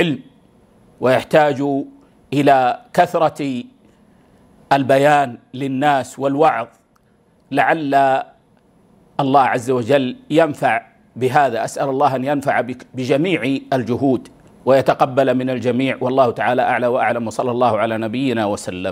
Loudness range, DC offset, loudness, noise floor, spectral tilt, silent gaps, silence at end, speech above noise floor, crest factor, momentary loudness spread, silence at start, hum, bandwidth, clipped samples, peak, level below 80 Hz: 2 LU; under 0.1%; -17 LUFS; -56 dBFS; -6 dB/octave; none; 0 s; 40 dB; 18 dB; 9 LU; 0 s; none; 16 kHz; under 0.1%; 0 dBFS; -60 dBFS